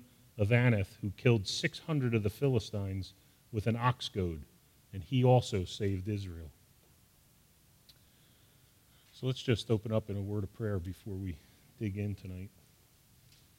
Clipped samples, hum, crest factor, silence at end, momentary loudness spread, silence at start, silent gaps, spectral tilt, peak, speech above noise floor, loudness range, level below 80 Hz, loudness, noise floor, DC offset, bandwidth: under 0.1%; none; 22 dB; 1.1 s; 18 LU; 0 s; none; -6.5 dB/octave; -12 dBFS; 33 dB; 9 LU; -60 dBFS; -33 LUFS; -65 dBFS; under 0.1%; 16 kHz